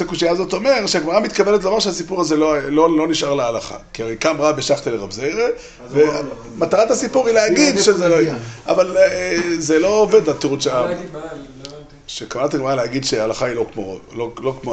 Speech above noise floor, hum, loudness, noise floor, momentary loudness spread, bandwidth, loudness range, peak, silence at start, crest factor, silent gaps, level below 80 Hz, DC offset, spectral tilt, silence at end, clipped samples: 20 dB; none; -17 LUFS; -37 dBFS; 15 LU; 9 kHz; 6 LU; -2 dBFS; 0 s; 16 dB; none; -46 dBFS; under 0.1%; -4 dB/octave; 0 s; under 0.1%